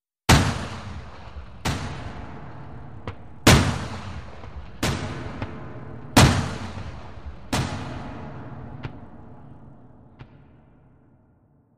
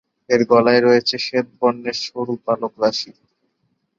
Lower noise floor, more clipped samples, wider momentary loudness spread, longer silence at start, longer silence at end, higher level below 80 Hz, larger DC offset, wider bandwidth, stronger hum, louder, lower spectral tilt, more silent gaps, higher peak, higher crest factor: second, -59 dBFS vs -69 dBFS; neither; first, 24 LU vs 11 LU; second, 0 s vs 0.3 s; second, 0 s vs 0.9 s; first, -36 dBFS vs -64 dBFS; first, 0.8% vs under 0.1%; first, 15 kHz vs 7.4 kHz; neither; second, -23 LUFS vs -18 LUFS; about the same, -4.5 dB/octave vs -4.5 dB/octave; neither; about the same, -4 dBFS vs -2 dBFS; about the same, 22 dB vs 18 dB